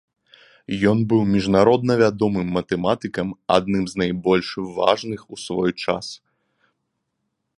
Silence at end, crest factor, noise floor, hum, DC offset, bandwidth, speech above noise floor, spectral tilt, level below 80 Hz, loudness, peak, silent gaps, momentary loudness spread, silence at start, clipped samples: 1.45 s; 22 dB; -76 dBFS; none; under 0.1%; 11 kHz; 56 dB; -6.5 dB/octave; -50 dBFS; -21 LUFS; 0 dBFS; none; 12 LU; 0.7 s; under 0.1%